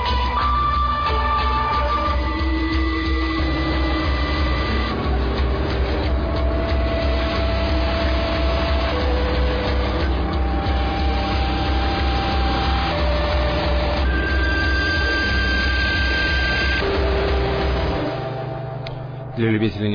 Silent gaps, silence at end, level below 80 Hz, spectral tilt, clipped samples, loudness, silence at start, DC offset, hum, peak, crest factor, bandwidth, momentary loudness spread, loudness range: none; 0 s; -22 dBFS; -7 dB/octave; under 0.1%; -21 LUFS; 0 s; under 0.1%; none; -8 dBFS; 12 dB; 5.2 kHz; 3 LU; 2 LU